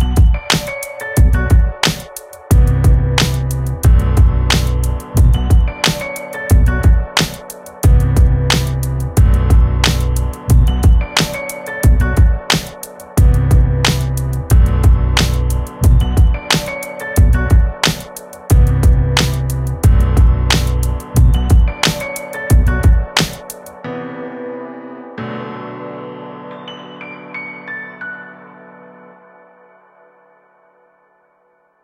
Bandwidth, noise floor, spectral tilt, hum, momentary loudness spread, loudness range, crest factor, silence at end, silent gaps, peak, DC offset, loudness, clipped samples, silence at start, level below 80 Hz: 16 kHz; -57 dBFS; -5 dB/octave; none; 16 LU; 14 LU; 14 dB; 3.5 s; none; 0 dBFS; under 0.1%; -14 LUFS; under 0.1%; 0 s; -16 dBFS